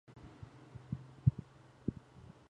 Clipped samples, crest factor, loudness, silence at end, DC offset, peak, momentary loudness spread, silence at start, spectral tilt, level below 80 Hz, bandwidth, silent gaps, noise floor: under 0.1%; 26 dB; -39 LUFS; 0.6 s; under 0.1%; -14 dBFS; 23 LU; 0.25 s; -10 dB/octave; -54 dBFS; 6 kHz; none; -58 dBFS